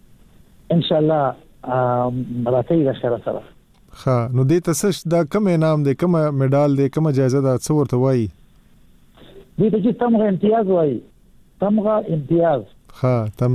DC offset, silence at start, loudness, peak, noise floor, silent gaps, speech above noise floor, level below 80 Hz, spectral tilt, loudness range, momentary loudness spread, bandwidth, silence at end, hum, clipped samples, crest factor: under 0.1%; 0.7 s; -19 LUFS; -6 dBFS; -50 dBFS; none; 32 dB; -50 dBFS; -7.5 dB/octave; 3 LU; 7 LU; 14.5 kHz; 0 s; none; under 0.1%; 14 dB